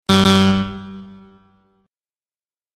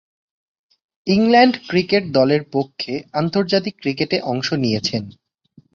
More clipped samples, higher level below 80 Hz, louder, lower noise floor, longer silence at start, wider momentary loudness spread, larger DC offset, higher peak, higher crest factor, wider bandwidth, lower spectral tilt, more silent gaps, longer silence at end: neither; first, -46 dBFS vs -56 dBFS; first, -15 LUFS vs -18 LUFS; first, under -90 dBFS vs -53 dBFS; second, 0.1 s vs 1.05 s; first, 23 LU vs 11 LU; neither; about the same, 0 dBFS vs -2 dBFS; about the same, 20 dB vs 18 dB; first, 13 kHz vs 7.2 kHz; about the same, -5.5 dB/octave vs -6 dB/octave; neither; first, 1.7 s vs 0.65 s